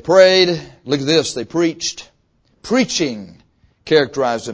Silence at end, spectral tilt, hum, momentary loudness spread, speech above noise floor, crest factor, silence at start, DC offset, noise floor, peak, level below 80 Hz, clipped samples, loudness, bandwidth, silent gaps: 0 s; -4 dB/octave; none; 14 LU; 44 dB; 16 dB; 0.05 s; under 0.1%; -60 dBFS; 0 dBFS; -54 dBFS; under 0.1%; -16 LUFS; 8 kHz; none